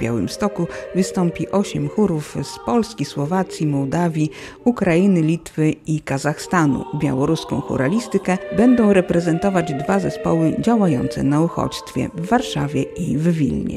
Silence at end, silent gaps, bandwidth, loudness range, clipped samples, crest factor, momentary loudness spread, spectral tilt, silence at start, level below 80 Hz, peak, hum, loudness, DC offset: 0 s; none; 13.5 kHz; 4 LU; under 0.1%; 16 dB; 7 LU; -6.5 dB/octave; 0 s; -46 dBFS; -2 dBFS; none; -19 LUFS; under 0.1%